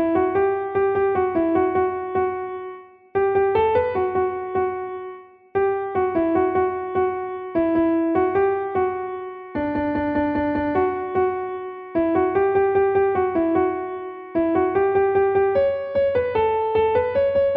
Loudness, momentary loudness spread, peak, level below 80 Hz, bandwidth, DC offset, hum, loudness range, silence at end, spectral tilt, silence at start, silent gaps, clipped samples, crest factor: -21 LUFS; 10 LU; -8 dBFS; -50 dBFS; 4.5 kHz; under 0.1%; none; 3 LU; 0 s; -10 dB/octave; 0 s; none; under 0.1%; 14 dB